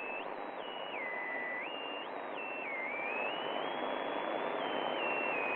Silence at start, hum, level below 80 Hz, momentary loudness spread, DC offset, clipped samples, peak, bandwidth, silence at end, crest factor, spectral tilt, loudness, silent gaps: 0 s; none; -86 dBFS; 7 LU; under 0.1%; under 0.1%; -22 dBFS; 6.4 kHz; 0 s; 16 dB; -6 dB/octave; -37 LUFS; none